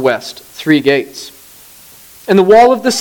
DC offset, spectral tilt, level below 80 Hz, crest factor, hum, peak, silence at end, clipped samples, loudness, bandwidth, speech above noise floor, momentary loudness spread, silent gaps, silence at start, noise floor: under 0.1%; -4.5 dB/octave; -50 dBFS; 12 dB; none; 0 dBFS; 0 s; under 0.1%; -11 LUFS; 19.5 kHz; 28 dB; 22 LU; none; 0 s; -39 dBFS